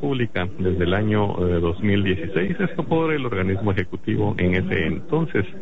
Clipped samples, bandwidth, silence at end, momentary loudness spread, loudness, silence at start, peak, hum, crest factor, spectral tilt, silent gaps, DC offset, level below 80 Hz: under 0.1%; 5.8 kHz; 0 s; 4 LU; -22 LUFS; 0 s; -8 dBFS; none; 14 dB; -9 dB/octave; none; 3%; -42 dBFS